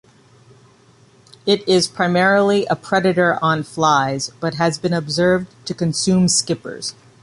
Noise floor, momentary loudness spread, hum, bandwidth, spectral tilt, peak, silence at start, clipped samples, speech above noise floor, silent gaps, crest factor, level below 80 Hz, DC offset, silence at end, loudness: -51 dBFS; 10 LU; none; 11.5 kHz; -4.5 dB/octave; -2 dBFS; 1.45 s; under 0.1%; 34 dB; none; 16 dB; -54 dBFS; under 0.1%; 0.3 s; -17 LUFS